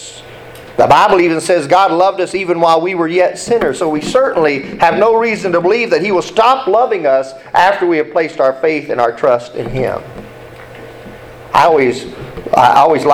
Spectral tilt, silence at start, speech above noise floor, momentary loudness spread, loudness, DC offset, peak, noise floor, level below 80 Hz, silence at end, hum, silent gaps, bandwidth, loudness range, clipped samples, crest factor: -5 dB/octave; 0 s; 21 dB; 20 LU; -12 LUFS; under 0.1%; 0 dBFS; -33 dBFS; -44 dBFS; 0 s; none; none; 15.5 kHz; 5 LU; under 0.1%; 12 dB